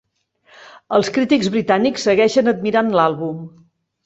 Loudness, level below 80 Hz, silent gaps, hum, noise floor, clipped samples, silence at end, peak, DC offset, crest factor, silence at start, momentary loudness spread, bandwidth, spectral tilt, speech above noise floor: -17 LUFS; -58 dBFS; none; none; -57 dBFS; under 0.1%; 0.55 s; 0 dBFS; under 0.1%; 18 dB; 0.6 s; 7 LU; 8.2 kHz; -5 dB/octave; 41 dB